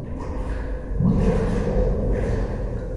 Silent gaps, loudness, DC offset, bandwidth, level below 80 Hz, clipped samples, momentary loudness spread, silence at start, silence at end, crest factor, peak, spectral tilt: none; -24 LUFS; under 0.1%; 10.5 kHz; -26 dBFS; under 0.1%; 10 LU; 0 s; 0 s; 14 dB; -8 dBFS; -9 dB/octave